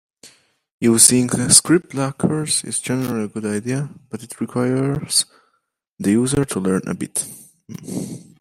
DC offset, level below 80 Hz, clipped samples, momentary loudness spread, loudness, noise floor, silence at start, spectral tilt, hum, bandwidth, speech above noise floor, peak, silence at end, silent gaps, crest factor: under 0.1%; -52 dBFS; under 0.1%; 19 LU; -18 LUFS; -69 dBFS; 0.25 s; -3.5 dB/octave; none; 16 kHz; 50 dB; 0 dBFS; 0.2 s; 0.71-0.79 s, 5.88-5.97 s; 20 dB